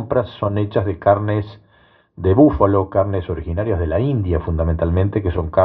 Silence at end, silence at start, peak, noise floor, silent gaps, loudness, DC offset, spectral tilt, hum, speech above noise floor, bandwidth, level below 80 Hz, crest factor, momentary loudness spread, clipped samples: 0 s; 0 s; 0 dBFS; -54 dBFS; none; -18 LUFS; under 0.1%; -12 dB/octave; none; 37 dB; 4.6 kHz; -34 dBFS; 18 dB; 9 LU; under 0.1%